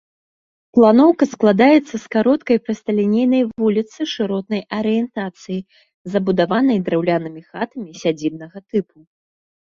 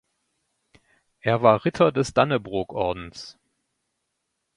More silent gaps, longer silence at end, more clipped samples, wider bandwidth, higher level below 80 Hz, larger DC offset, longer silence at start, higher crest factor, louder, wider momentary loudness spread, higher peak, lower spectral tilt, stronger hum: first, 5.94-6.05 s vs none; second, 0.9 s vs 1.25 s; neither; second, 7.4 kHz vs 11.5 kHz; second, -60 dBFS vs -54 dBFS; neither; second, 0.75 s vs 1.25 s; second, 16 dB vs 22 dB; first, -18 LUFS vs -22 LUFS; second, 15 LU vs 18 LU; about the same, -2 dBFS vs -2 dBFS; about the same, -6.5 dB/octave vs -6 dB/octave; neither